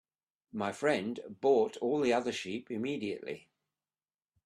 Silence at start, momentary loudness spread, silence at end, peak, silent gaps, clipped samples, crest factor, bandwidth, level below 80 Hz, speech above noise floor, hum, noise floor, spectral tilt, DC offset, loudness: 0.55 s; 12 LU; 1.05 s; -16 dBFS; none; under 0.1%; 18 dB; 12 kHz; -76 dBFS; over 58 dB; none; under -90 dBFS; -5 dB/octave; under 0.1%; -33 LUFS